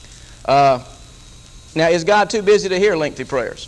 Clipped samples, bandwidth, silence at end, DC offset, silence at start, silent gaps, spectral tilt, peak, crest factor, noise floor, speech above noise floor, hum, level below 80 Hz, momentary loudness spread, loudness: under 0.1%; 11.5 kHz; 0 s; under 0.1%; 0.05 s; none; -4.5 dB/octave; -2 dBFS; 14 dB; -41 dBFS; 25 dB; none; -44 dBFS; 9 LU; -16 LUFS